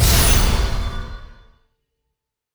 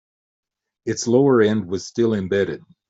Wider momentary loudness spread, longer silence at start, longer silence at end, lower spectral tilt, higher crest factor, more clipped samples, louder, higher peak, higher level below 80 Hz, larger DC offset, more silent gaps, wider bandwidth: first, 19 LU vs 11 LU; second, 0 s vs 0.85 s; first, 1.3 s vs 0.3 s; second, -3.5 dB/octave vs -6 dB/octave; about the same, 18 dB vs 16 dB; neither; about the same, -18 LUFS vs -20 LUFS; about the same, -2 dBFS vs -4 dBFS; first, -22 dBFS vs -62 dBFS; neither; neither; first, over 20 kHz vs 8 kHz